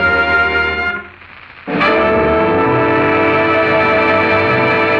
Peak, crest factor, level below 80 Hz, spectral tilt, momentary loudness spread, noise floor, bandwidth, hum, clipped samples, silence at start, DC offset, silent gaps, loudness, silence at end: -2 dBFS; 10 dB; -38 dBFS; -7 dB/octave; 6 LU; -37 dBFS; 7.4 kHz; none; under 0.1%; 0 s; under 0.1%; none; -12 LUFS; 0 s